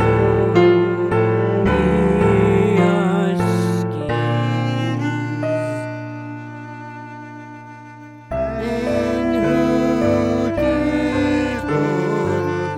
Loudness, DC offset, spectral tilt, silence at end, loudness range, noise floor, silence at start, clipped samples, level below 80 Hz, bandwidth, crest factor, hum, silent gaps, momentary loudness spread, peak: -18 LUFS; under 0.1%; -7.5 dB/octave; 0 s; 11 LU; -38 dBFS; 0 s; under 0.1%; -36 dBFS; 12.5 kHz; 16 dB; none; none; 18 LU; -2 dBFS